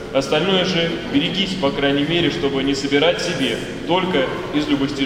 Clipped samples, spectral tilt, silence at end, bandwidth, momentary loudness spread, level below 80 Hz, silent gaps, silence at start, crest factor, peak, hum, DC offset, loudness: under 0.1%; -5 dB/octave; 0 s; 14.5 kHz; 4 LU; -42 dBFS; none; 0 s; 16 dB; -2 dBFS; none; under 0.1%; -19 LUFS